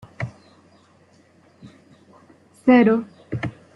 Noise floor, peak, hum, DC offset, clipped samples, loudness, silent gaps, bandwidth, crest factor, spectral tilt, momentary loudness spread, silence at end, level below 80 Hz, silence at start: -55 dBFS; -4 dBFS; none; under 0.1%; under 0.1%; -20 LUFS; none; 5.6 kHz; 20 dB; -8.5 dB/octave; 18 LU; 0.25 s; -60 dBFS; 0.2 s